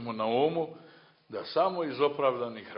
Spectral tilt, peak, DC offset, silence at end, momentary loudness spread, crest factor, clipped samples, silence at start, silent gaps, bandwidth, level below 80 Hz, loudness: -9.5 dB/octave; -12 dBFS; under 0.1%; 0 s; 12 LU; 18 dB; under 0.1%; 0 s; none; 5.6 kHz; -76 dBFS; -30 LUFS